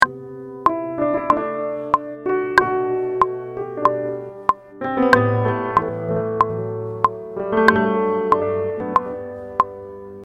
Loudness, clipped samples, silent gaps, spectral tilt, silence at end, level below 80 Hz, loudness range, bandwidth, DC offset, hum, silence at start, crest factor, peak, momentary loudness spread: -20 LUFS; under 0.1%; none; -7 dB/octave; 0 s; -50 dBFS; 2 LU; 12 kHz; under 0.1%; none; 0 s; 20 dB; 0 dBFS; 11 LU